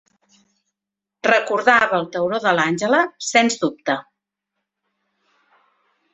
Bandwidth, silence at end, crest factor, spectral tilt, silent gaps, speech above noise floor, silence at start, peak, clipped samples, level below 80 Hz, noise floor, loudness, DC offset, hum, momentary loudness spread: 8.4 kHz; 2.15 s; 20 dB; -3.5 dB/octave; none; 67 dB; 1.25 s; -2 dBFS; under 0.1%; -66 dBFS; -85 dBFS; -18 LUFS; under 0.1%; 50 Hz at -55 dBFS; 8 LU